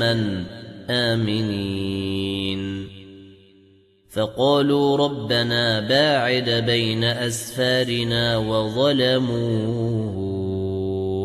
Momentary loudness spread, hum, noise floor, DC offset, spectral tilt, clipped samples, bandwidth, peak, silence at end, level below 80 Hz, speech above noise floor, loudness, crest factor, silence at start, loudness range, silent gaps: 8 LU; none; -55 dBFS; under 0.1%; -5.5 dB/octave; under 0.1%; 14 kHz; -6 dBFS; 0 s; -52 dBFS; 34 dB; -21 LUFS; 16 dB; 0 s; 6 LU; none